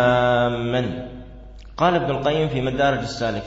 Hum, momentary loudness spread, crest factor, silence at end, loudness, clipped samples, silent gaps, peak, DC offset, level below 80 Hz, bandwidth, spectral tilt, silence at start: none; 16 LU; 16 dB; 0 s; -21 LUFS; under 0.1%; none; -6 dBFS; under 0.1%; -42 dBFS; 8 kHz; -6.5 dB/octave; 0 s